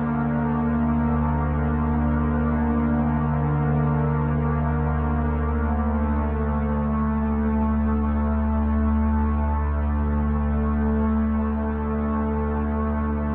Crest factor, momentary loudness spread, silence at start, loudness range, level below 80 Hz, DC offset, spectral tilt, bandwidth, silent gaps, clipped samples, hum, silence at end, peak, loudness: 10 dB; 2 LU; 0 s; 1 LU; -26 dBFS; under 0.1%; -13 dB/octave; 3.4 kHz; none; under 0.1%; none; 0 s; -10 dBFS; -23 LUFS